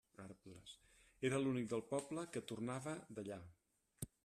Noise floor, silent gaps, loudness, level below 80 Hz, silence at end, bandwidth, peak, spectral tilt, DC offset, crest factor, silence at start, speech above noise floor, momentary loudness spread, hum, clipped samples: -68 dBFS; none; -45 LUFS; -76 dBFS; 0.2 s; 13.5 kHz; -28 dBFS; -5.5 dB/octave; under 0.1%; 18 dB; 0.2 s; 25 dB; 18 LU; none; under 0.1%